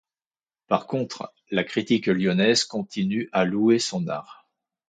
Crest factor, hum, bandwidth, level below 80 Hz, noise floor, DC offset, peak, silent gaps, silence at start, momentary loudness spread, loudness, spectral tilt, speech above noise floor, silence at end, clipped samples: 20 dB; none; 9.4 kHz; -64 dBFS; under -90 dBFS; under 0.1%; -4 dBFS; none; 0.7 s; 10 LU; -24 LUFS; -5 dB/octave; over 66 dB; 0.55 s; under 0.1%